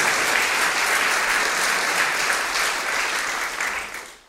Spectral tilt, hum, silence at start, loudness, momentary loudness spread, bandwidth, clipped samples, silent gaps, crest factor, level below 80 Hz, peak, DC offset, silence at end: 0.5 dB/octave; none; 0 s; -20 LUFS; 6 LU; 16 kHz; under 0.1%; none; 16 dB; -54 dBFS; -6 dBFS; under 0.1%; 0.1 s